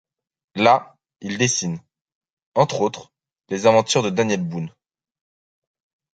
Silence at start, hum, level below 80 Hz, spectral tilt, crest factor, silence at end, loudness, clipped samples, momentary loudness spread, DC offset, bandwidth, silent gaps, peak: 0.55 s; none; -62 dBFS; -4 dB/octave; 22 dB; 1.45 s; -20 LUFS; under 0.1%; 18 LU; under 0.1%; 9.4 kHz; 2.01-2.05 s, 2.15-2.21 s, 2.30-2.37 s, 2.46-2.52 s; 0 dBFS